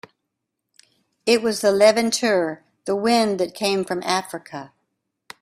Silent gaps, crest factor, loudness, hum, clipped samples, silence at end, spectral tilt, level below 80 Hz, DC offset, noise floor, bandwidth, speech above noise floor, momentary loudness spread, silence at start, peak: none; 20 dB; -20 LUFS; none; under 0.1%; 0.75 s; -3.5 dB/octave; -66 dBFS; under 0.1%; -80 dBFS; 15.5 kHz; 60 dB; 18 LU; 1.25 s; -2 dBFS